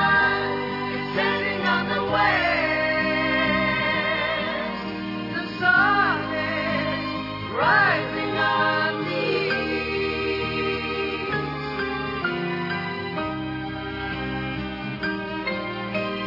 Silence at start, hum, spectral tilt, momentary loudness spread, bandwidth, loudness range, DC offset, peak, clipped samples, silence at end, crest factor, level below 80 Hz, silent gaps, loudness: 0 s; none; -6.5 dB/octave; 10 LU; 5.8 kHz; 6 LU; under 0.1%; -6 dBFS; under 0.1%; 0 s; 18 dB; -48 dBFS; none; -23 LUFS